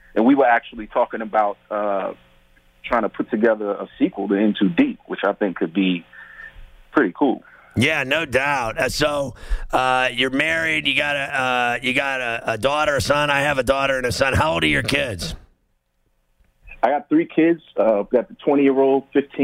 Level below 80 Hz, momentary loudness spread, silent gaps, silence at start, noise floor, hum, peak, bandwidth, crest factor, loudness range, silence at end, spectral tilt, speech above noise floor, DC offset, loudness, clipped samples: -40 dBFS; 8 LU; none; 0.15 s; -67 dBFS; none; -4 dBFS; 16 kHz; 16 dB; 3 LU; 0 s; -5 dB/octave; 47 dB; under 0.1%; -20 LUFS; under 0.1%